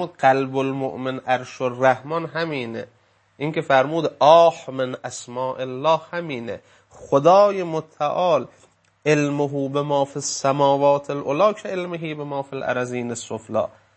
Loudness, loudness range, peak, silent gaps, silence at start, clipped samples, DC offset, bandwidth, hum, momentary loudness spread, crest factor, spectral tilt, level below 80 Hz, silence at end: -21 LUFS; 3 LU; -2 dBFS; none; 0 s; under 0.1%; under 0.1%; 8.8 kHz; none; 13 LU; 20 dB; -5 dB/octave; -68 dBFS; 0.3 s